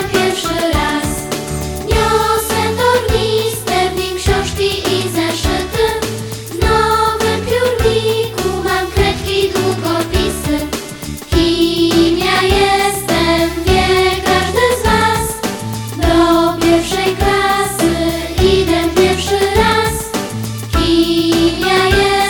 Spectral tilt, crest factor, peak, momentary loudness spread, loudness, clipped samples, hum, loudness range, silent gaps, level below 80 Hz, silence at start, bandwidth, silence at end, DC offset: -4.5 dB/octave; 14 dB; 0 dBFS; 7 LU; -14 LUFS; under 0.1%; none; 3 LU; none; -26 dBFS; 0 s; 19 kHz; 0 s; 0.2%